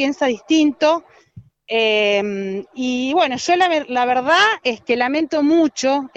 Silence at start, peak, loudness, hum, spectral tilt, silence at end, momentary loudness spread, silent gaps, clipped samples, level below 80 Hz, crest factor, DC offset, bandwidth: 0 s; -2 dBFS; -17 LUFS; none; -3.5 dB/octave; 0.1 s; 8 LU; none; under 0.1%; -62 dBFS; 16 dB; under 0.1%; 8.4 kHz